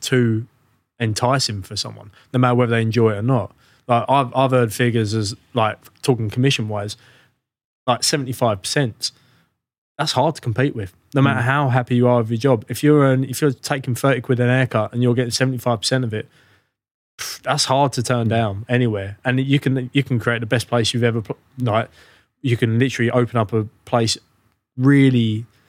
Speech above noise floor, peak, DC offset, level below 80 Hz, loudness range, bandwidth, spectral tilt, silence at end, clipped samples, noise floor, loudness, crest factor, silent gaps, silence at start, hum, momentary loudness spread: 44 dB; -2 dBFS; under 0.1%; -64 dBFS; 4 LU; 16 kHz; -5.5 dB/octave; 0.25 s; under 0.1%; -63 dBFS; -19 LUFS; 18 dB; 7.64-7.86 s, 9.78-9.96 s, 16.91-17.18 s; 0 s; none; 10 LU